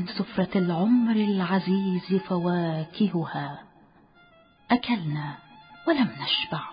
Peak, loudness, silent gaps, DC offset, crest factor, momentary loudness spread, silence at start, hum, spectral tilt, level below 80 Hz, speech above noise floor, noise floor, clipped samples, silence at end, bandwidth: -10 dBFS; -26 LUFS; none; under 0.1%; 16 dB; 11 LU; 0 s; none; -11 dB/octave; -64 dBFS; 32 dB; -57 dBFS; under 0.1%; 0 s; 5.2 kHz